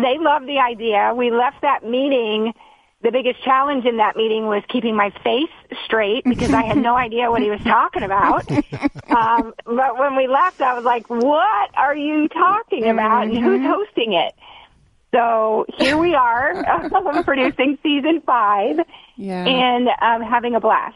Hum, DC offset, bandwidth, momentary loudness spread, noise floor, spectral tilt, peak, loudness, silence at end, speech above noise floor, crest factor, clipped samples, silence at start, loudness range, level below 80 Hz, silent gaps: none; under 0.1%; 11.5 kHz; 5 LU; -53 dBFS; -5.5 dB/octave; -2 dBFS; -18 LUFS; 0.05 s; 36 dB; 14 dB; under 0.1%; 0 s; 2 LU; -48 dBFS; none